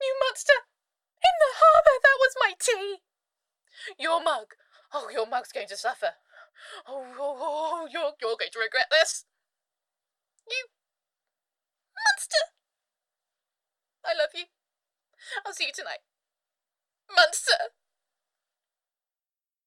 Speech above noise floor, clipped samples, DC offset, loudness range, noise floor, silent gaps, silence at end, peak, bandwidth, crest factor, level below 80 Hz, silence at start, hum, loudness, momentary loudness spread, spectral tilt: over 62 dB; under 0.1%; under 0.1%; 12 LU; under -90 dBFS; none; 2 s; -6 dBFS; 15.5 kHz; 22 dB; -68 dBFS; 0 s; none; -24 LUFS; 19 LU; 1 dB/octave